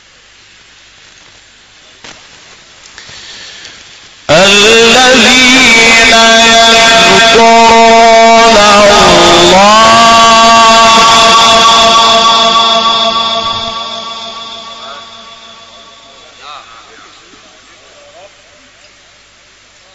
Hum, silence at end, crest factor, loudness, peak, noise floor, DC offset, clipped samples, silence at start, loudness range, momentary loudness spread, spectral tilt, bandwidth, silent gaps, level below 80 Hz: none; 3.35 s; 6 dB; -3 LUFS; 0 dBFS; -41 dBFS; under 0.1%; 0.9%; 2.05 s; 12 LU; 18 LU; -1.5 dB/octave; 14.5 kHz; none; -34 dBFS